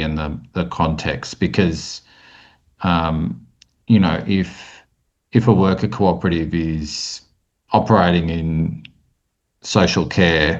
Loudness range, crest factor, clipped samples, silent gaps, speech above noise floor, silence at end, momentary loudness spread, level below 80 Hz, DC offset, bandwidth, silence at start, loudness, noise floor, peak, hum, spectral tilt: 4 LU; 18 dB; under 0.1%; none; 53 dB; 0 s; 13 LU; -40 dBFS; under 0.1%; 8.2 kHz; 0 s; -19 LUFS; -71 dBFS; 0 dBFS; none; -6 dB/octave